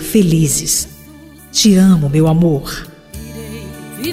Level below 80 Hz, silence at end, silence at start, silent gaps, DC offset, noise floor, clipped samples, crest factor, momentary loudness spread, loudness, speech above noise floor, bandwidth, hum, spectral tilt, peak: -36 dBFS; 0 s; 0 s; none; under 0.1%; -38 dBFS; under 0.1%; 12 dB; 20 LU; -12 LUFS; 26 dB; 16 kHz; none; -5 dB/octave; -2 dBFS